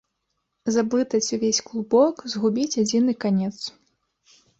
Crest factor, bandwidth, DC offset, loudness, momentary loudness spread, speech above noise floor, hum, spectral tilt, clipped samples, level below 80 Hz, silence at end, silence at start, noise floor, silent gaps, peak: 16 dB; 8 kHz; under 0.1%; -23 LUFS; 9 LU; 55 dB; none; -4.5 dB/octave; under 0.1%; -66 dBFS; 0.9 s; 0.65 s; -76 dBFS; none; -6 dBFS